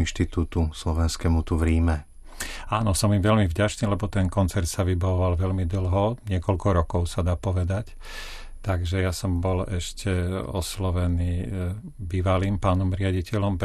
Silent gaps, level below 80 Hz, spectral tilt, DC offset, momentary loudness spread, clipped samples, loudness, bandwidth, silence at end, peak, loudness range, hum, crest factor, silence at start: none; -36 dBFS; -6 dB/octave; under 0.1%; 9 LU; under 0.1%; -25 LUFS; 13.5 kHz; 0 s; -10 dBFS; 4 LU; none; 14 dB; 0 s